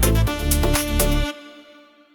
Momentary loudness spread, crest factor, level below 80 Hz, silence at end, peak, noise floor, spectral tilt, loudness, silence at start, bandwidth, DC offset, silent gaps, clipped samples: 8 LU; 16 dB; -24 dBFS; 0.55 s; -4 dBFS; -49 dBFS; -4.5 dB/octave; -21 LUFS; 0 s; over 20 kHz; under 0.1%; none; under 0.1%